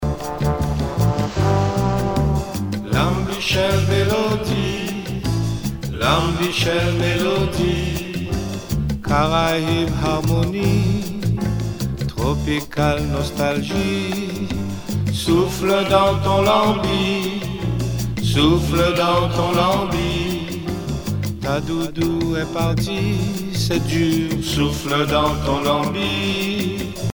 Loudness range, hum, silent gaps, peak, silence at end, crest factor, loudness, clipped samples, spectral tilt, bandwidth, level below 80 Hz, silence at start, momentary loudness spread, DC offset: 3 LU; none; none; -2 dBFS; 0 s; 16 dB; -20 LUFS; under 0.1%; -5.5 dB/octave; over 20 kHz; -32 dBFS; 0 s; 8 LU; under 0.1%